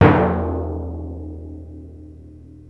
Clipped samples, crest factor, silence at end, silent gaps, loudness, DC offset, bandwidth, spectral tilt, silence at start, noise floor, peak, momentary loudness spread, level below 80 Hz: under 0.1%; 20 dB; 0.05 s; none; -22 LUFS; under 0.1%; 5.2 kHz; -10 dB/octave; 0 s; -41 dBFS; 0 dBFS; 23 LU; -34 dBFS